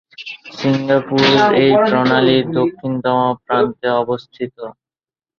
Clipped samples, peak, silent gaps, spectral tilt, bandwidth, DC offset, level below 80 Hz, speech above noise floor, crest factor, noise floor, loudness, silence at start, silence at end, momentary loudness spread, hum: under 0.1%; 0 dBFS; none; -6.5 dB/octave; 7 kHz; under 0.1%; -56 dBFS; over 75 dB; 16 dB; under -90 dBFS; -15 LUFS; 0.2 s; 0.7 s; 17 LU; none